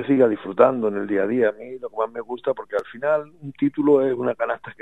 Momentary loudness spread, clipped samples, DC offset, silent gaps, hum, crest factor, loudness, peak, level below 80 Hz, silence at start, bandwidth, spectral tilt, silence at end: 10 LU; under 0.1%; 0.2%; none; none; 20 dB; -22 LUFS; -2 dBFS; -68 dBFS; 0 s; 4.1 kHz; -8.5 dB/octave; 0.1 s